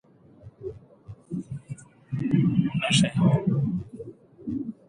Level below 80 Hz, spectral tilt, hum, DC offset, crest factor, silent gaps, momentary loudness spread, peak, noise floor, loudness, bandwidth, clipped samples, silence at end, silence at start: -56 dBFS; -5.5 dB/octave; none; under 0.1%; 20 dB; none; 20 LU; -8 dBFS; -50 dBFS; -25 LUFS; 10.5 kHz; under 0.1%; 0.15 s; 0.45 s